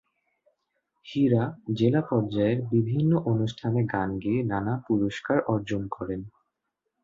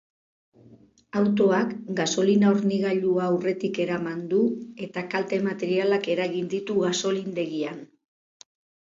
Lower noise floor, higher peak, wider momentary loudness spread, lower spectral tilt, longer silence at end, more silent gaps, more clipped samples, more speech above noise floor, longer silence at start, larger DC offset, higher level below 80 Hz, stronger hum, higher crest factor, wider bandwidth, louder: first, -82 dBFS vs -54 dBFS; about the same, -8 dBFS vs -10 dBFS; about the same, 9 LU vs 9 LU; first, -8.5 dB/octave vs -5.5 dB/octave; second, 0.75 s vs 1.15 s; neither; neither; first, 56 dB vs 30 dB; first, 1.05 s vs 0.7 s; neither; first, -56 dBFS vs -70 dBFS; neither; about the same, 18 dB vs 16 dB; about the same, 7.6 kHz vs 7.8 kHz; about the same, -27 LUFS vs -25 LUFS